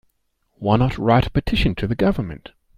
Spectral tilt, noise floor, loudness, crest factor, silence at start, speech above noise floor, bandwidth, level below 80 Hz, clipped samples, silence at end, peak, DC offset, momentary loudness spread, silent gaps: -8 dB/octave; -68 dBFS; -20 LUFS; 18 dB; 0.6 s; 50 dB; 15 kHz; -32 dBFS; under 0.1%; 0.4 s; -2 dBFS; under 0.1%; 10 LU; none